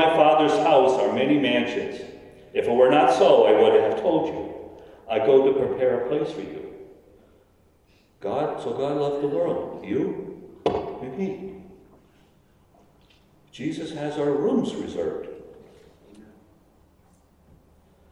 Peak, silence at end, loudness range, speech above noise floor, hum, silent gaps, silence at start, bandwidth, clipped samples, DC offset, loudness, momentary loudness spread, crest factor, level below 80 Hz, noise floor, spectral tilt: -4 dBFS; 1.9 s; 14 LU; 38 dB; none; none; 0 s; 11 kHz; under 0.1%; under 0.1%; -22 LUFS; 19 LU; 20 dB; -60 dBFS; -59 dBFS; -6 dB/octave